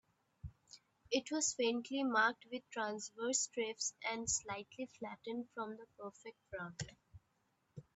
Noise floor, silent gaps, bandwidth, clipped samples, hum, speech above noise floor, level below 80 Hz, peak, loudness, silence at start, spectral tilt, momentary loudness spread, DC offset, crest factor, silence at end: -80 dBFS; none; 8.4 kHz; under 0.1%; none; 40 dB; -70 dBFS; -18 dBFS; -39 LUFS; 0.45 s; -2 dB/octave; 18 LU; under 0.1%; 24 dB; 0.15 s